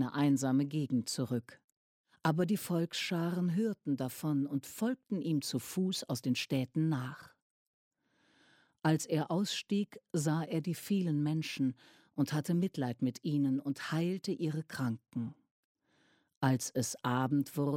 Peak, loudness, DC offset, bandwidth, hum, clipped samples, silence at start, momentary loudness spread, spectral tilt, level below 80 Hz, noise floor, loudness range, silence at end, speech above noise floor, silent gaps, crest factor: -16 dBFS; -34 LUFS; under 0.1%; 16.5 kHz; none; under 0.1%; 0 s; 5 LU; -5.5 dB/octave; -78 dBFS; -72 dBFS; 3 LU; 0 s; 38 dB; 1.64-1.68 s, 1.77-2.04 s, 7.42-7.91 s, 15.51-15.75 s, 16.37-16.41 s; 20 dB